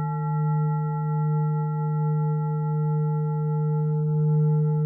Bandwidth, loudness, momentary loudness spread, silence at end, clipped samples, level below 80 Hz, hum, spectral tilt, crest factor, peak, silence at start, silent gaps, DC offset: 2 kHz; -25 LUFS; 4 LU; 0 s; under 0.1%; -64 dBFS; 60 Hz at -55 dBFS; -14.5 dB/octave; 8 dB; -16 dBFS; 0 s; none; under 0.1%